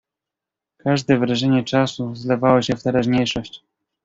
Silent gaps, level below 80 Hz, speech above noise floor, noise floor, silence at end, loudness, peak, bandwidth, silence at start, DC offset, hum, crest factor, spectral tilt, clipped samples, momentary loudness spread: none; -52 dBFS; 67 dB; -86 dBFS; 0.45 s; -19 LUFS; -2 dBFS; 7.8 kHz; 0.85 s; under 0.1%; none; 18 dB; -6 dB/octave; under 0.1%; 11 LU